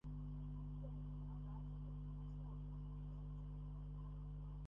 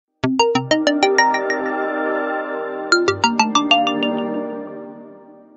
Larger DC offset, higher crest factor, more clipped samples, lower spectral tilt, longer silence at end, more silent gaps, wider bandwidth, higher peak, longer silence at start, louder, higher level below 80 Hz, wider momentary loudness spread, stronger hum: neither; second, 8 dB vs 18 dB; neither; first, -10.5 dB/octave vs -3.5 dB/octave; second, 0 s vs 0.25 s; neither; second, 3.5 kHz vs 8.2 kHz; second, -40 dBFS vs -2 dBFS; second, 0.05 s vs 0.25 s; second, -51 LUFS vs -18 LUFS; first, -52 dBFS vs -58 dBFS; second, 2 LU vs 12 LU; first, 50 Hz at -50 dBFS vs none